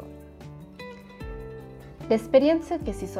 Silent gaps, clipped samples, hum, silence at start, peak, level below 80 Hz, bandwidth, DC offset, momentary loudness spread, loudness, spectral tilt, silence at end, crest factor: none; under 0.1%; none; 0 s; -8 dBFS; -46 dBFS; 14.5 kHz; under 0.1%; 24 LU; -23 LUFS; -6.5 dB/octave; 0 s; 20 dB